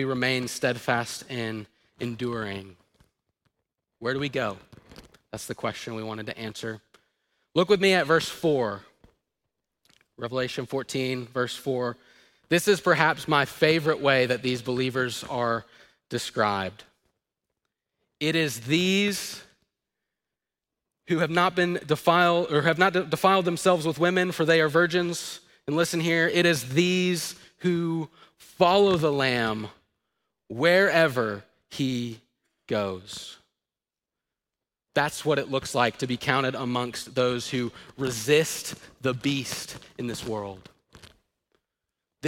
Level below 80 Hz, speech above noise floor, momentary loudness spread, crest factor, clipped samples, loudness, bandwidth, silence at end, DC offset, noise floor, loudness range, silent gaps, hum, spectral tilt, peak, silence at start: -64 dBFS; over 65 dB; 14 LU; 22 dB; under 0.1%; -25 LUFS; 16.5 kHz; 0 s; under 0.1%; under -90 dBFS; 10 LU; none; none; -4.5 dB/octave; -4 dBFS; 0 s